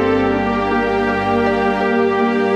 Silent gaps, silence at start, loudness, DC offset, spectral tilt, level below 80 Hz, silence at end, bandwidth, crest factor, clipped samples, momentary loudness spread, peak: none; 0 s; -16 LUFS; under 0.1%; -7 dB/octave; -40 dBFS; 0 s; 9.2 kHz; 12 dB; under 0.1%; 1 LU; -4 dBFS